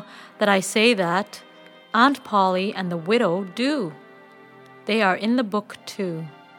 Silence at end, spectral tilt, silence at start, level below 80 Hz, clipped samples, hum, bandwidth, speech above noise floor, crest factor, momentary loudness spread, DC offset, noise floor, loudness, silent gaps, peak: 0.3 s; -4.5 dB/octave; 0 s; -80 dBFS; under 0.1%; none; 18 kHz; 26 dB; 20 dB; 16 LU; under 0.1%; -47 dBFS; -22 LUFS; none; -2 dBFS